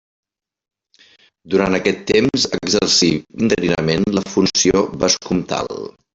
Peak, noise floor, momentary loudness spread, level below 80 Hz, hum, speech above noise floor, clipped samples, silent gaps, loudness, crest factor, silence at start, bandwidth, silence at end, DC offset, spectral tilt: 0 dBFS; -53 dBFS; 7 LU; -46 dBFS; none; 35 dB; under 0.1%; none; -17 LUFS; 18 dB; 1.45 s; 8.4 kHz; 0.25 s; under 0.1%; -3.5 dB/octave